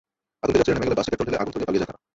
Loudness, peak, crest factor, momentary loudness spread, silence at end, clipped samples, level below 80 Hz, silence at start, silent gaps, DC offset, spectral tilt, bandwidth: -24 LUFS; -6 dBFS; 18 dB; 6 LU; 0.25 s; under 0.1%; -46 dBFS; 0.45 s; none; under 0.1%; -6 dB/octave; 8 kHz